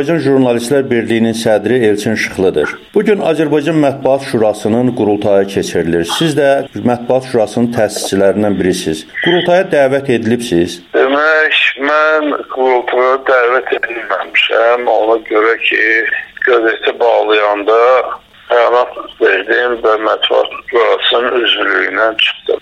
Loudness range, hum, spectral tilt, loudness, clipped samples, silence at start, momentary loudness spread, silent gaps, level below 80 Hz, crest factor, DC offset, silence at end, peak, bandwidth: 2 LU; none; -4.5 dB/octave; -12 LUFS; under 0.1%; 0 s; 5 LU; none; -50 dBFS; 12 dB; under 0.1%; 0 s; 0 dBFS; 14 kHz